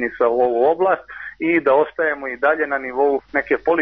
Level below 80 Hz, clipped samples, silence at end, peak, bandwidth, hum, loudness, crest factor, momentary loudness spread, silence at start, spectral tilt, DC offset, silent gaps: -56 dBFS; under 0.1%; 0 s; -6 dBFS; 5.4 kHz; none; -19 LUFS; 14 dB; 5 LU; 0 s; -3.5 dB/octave; under 0.1%; none